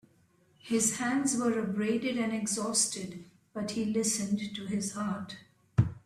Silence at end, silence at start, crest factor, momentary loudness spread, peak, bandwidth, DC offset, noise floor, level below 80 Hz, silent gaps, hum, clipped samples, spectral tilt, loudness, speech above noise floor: 0.05 s; 0.65 s; 20 dB; 11 LU; -12 dBFS; 15 kHz; under 0.1%; -66 dBFS; -58 dBFS; none; none; under 0.1%; -4 dB/octave; -31 LUFS; 35 dB